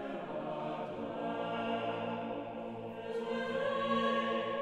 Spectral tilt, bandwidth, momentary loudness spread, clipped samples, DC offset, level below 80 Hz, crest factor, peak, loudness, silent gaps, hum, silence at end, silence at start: -6 dB/octave; 10.5 kHz; 9 LU; under 0.1%; under 0.1%; -70 dBFS; 16 dB; -20 dBFS; -37 LUFS; none; none; 0 s; 0 s